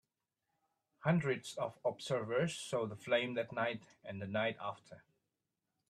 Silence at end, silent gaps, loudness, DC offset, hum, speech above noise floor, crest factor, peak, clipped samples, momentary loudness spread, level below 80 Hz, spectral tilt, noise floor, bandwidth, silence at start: 0.9 s; none; -38 LUFS; under 0.1%; none; 51 dB; 20 dB; -18 dBFS; under 0.1%; 11 LU; -78 dBFS; -5.5 dB/octave; -89 dBFS; 13 kHz; 1 s